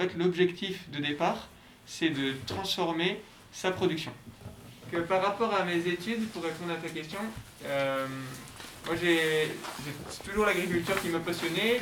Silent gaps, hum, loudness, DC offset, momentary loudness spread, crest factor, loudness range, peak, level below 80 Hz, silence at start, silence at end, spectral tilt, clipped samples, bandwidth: none; none; -31 LUFS; under 0.1%; 15 LU; 18 dB; 2 LU; -14 dBFS; -60 dBFS; 0 s; 0 s; -4.5 dB/octave; under 0.1%; 20 kHz